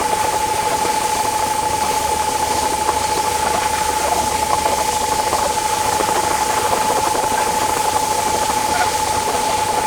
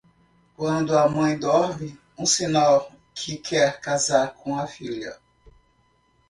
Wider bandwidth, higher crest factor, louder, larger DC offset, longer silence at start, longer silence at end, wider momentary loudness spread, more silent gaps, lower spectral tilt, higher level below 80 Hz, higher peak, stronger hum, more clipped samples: first, over 20 kHz vs 11.5 kHz; about the same, 18 dB vs 20 dB; first, -17 LUFS vs -23 LUFS; neither; second, 0 s vs 0.6 s; second, 0 s vs 1.15 s; second, 1 LU vs 14 LU; neither; second, -2 dB/octave vs -4 dB/octave; first, -40 dBFS vs -58 dBFS; first, 0 dBFS vs -4 dBFS; neither; neither